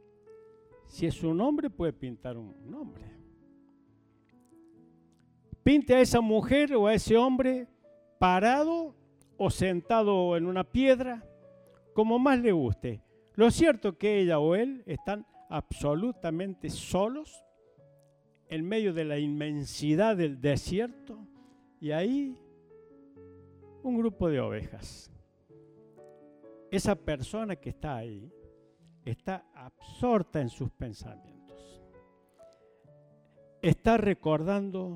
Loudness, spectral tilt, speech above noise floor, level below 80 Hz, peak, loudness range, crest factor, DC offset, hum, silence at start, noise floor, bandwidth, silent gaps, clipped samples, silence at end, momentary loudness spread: -29 LUFS; -6.5 dB/octave; 37 dB; -52 dBFS; -10 dBFS; 11 LU; 22 dB; under 0.1%; none; 0.3 s; -65 dBFS; 15.5 kHz; none; under 0.1%; 0 s; 19 LU